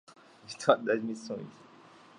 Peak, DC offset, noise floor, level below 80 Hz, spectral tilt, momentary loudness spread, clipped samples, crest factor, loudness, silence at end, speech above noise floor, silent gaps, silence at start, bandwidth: -8 dBFS; under 0.1%; -56 dBFS; -84 dBFS; -4.5 dB/octave; 18 LU; under 0.1%; 26 dB; -31 LUFS; 0.65 s; 25 dB; none; 0.1 s; 11 kHz